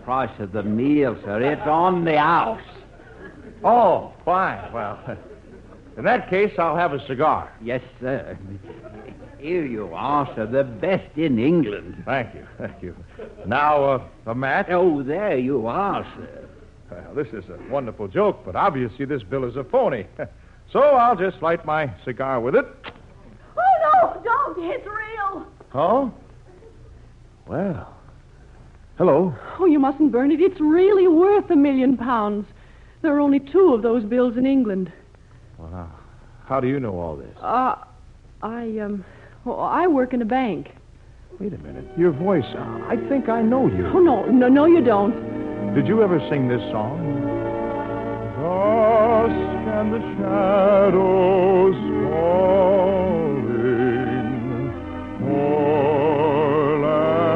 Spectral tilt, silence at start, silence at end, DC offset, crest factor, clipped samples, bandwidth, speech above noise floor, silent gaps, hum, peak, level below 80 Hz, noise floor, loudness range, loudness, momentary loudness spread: -9 dB/octave; 0.05 s; 0 s; under 0.1%; 14 dB; under 0.1%; 5.8 kHz; 27 dB; none; none; -6 dBFS; -48 dBFS; -47 dBFS; 9 LU; -20 LUFS; 16 LU